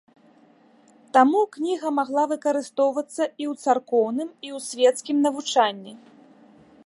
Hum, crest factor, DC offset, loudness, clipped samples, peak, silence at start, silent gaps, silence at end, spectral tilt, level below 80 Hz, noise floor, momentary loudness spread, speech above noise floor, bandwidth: none; 20 dB; under 0.1%; -23 LUFS; under 0.1%; -4 dBFS; 1.15 s; none; 0.9 s; -3 dB/octave; -82 dBFS; -56 dBFS; 11 LU; 33 dB; 11.5 kHz